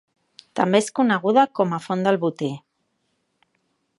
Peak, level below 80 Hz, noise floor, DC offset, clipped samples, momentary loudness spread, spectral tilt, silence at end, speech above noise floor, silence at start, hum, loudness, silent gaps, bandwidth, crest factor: -4 dBFS; -74 dBFS; -72 dBFS; under 0.1%; under 0.1%; 12 LU; -5.5 dB/octave; 1.4 s; 52 dB; 0.55 s; none; -21 LUFS; none; 11.5 kHz; 20 dB